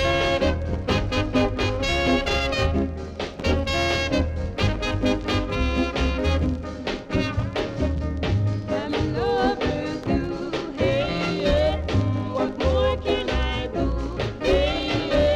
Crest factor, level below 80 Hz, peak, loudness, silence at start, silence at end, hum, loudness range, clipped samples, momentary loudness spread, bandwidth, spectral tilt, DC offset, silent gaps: 14 dB; -30 dBFS; -8 dBFS; -24 LUFS; 0 s; 0 s; none; 2 LU; under 0.1%; 6 LU; 11 kHz; -6 dB/octave; under 0.1%; none